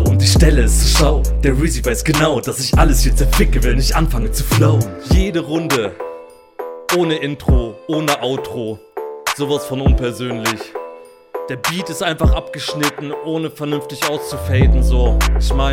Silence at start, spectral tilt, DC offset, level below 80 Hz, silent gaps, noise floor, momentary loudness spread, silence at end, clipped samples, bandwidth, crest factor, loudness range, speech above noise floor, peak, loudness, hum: 0 s; -5 dB/octave; under 0.1%; -18 dBFS; none; -36 dBFS; 13 LU; 0 s; under 0.1%; 16.5 kHz; 16 dB; 6 LU; 22 dB; 0 dBFS; -17 LUFS; none